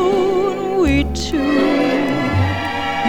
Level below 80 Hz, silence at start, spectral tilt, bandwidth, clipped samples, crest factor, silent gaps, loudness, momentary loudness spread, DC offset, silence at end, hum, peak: -30 dBFS; 0 s; -6 dB/octave; 16 kHz; under 0.1%; 12 dB; none; -17 LUFS; 4 LU; under 0.1%; 0 s; none; -4 dBFS